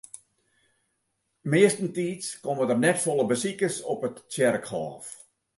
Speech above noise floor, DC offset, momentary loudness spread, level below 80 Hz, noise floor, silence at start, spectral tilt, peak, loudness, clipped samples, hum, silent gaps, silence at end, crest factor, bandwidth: 51 dB; under 0.1%; 19 LU; -72 dBFS; -77 dBFS; 1.45 s; -4.5 dB/octave; -8 dBFS; -26 LUFS; under 0.1%; none; none; 0.45 s; 20 dB; 12 kHz